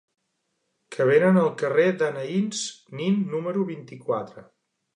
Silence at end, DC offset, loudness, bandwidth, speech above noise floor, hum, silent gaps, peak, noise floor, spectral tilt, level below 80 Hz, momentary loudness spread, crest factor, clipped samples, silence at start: 0.55 s; under 0.1%; -24 LUFS; 10 kHz; 52 dB; none; none; -8 dBFS; -76 dBFS; -6 dB/octave; -76 dBFS; 13 LU; 18 dB; under 0.1%; 0.9 s